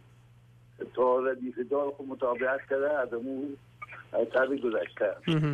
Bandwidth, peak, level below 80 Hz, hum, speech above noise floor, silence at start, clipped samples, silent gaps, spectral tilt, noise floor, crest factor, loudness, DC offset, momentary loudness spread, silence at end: 9.4 kHz; -16 dBFS; -68 dBFS; 60 Hz at -60 dBFS; 28 dB; 0.8 s; under 0.1%; none; -8 dB/octave; -57 dBFS; 14 dB; -30 LUFS; under 0.1%; 12 LU; 0 s